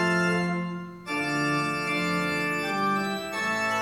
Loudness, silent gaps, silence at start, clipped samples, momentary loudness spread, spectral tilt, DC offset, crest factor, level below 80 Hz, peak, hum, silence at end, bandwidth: -27 LUFS; none; 0 s; under 0.1%; 6 LU; -5 dB/octave; under 0.1%; 14 dB; -66 dBFS; -14 dBFS; none; 0 s; 16.5 kHz